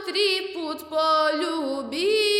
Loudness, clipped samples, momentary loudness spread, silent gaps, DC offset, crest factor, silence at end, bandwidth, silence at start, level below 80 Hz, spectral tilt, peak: -24 LUFS; under 0.1%; 8 LU; none; under 0.1%; 14 dB; 0 s; 16 kHz; 0 s; -70 dBFS; -1.5 dB/octave; -10 dBFS